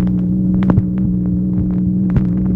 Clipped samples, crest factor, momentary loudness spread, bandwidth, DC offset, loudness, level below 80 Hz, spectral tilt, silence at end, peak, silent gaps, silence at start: under 0.1%; 14 dB; 3 LU; 3.1 kHz; under 0.1%; -16 LUFS; -28 dBFS; -12 dB/octave; 0 s; 0 dBFS; none; 0 s